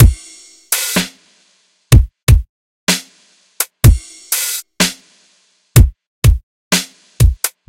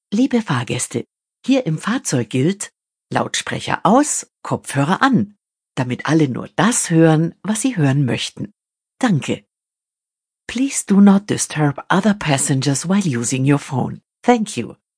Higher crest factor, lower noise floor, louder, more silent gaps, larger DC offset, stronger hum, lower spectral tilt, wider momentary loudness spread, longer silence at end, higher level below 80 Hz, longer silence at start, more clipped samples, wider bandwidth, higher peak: about the same, 14 dB vs 18 dB; second, -57 dBFS vs -88 dBFS; first, -15 LUFS vs -18 LUFS; first, 2.23-2.27 s, 2.49-2.87 s, 6.07-6.22 s, 6.43-6.71 s vs none; neither; neither; about the same, -4 dB/octave vs -5 dB/octave; about the same, 10 LU vs 12 LU; about the same, 0.2 s vs 0.25 s; first, -18 dBFS vs -58 dBFS; about the same, 0 s vs 0.1 s; first, 0.8% vs under 0.1%; first, 17.5 kHz vs 10.5 kHz; about the same, 0 dBFS vs 0 dBFS